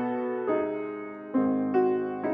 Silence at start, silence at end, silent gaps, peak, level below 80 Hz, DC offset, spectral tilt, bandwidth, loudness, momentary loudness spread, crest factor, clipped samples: 0 s; 0 s; none; -14 dBFS; -74 dBFS; under 0.1%; -10 dB/octave; 3.6 kHz; -28 LUFS; 9 LU; 14 dB; under 0.1%